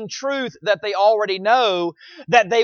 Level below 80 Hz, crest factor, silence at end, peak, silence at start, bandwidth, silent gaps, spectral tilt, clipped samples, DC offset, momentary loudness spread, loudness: -66 dBFS; 18 dB; 0 s; 0 dBFS; 0 s; 7 kHz; none; -3.5 dB/octave; under 0.1%; under 0.1%; 8 LU; -19 LUFS